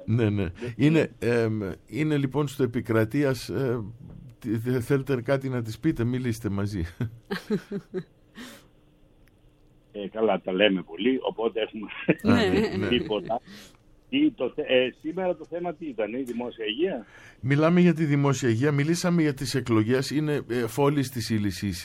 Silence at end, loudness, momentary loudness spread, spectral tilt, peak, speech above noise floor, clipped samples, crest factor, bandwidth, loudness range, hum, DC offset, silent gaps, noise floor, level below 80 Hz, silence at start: 0 s; -26 LUFS; 11 LU; -6.5 dB/octave; -4 dBFS; 32 dB; under 0.1%; 22 dB; 16.5 kHz; 7 LU; none; under 0.1%; none; -58 dBFS; -52 dBFS; 0 s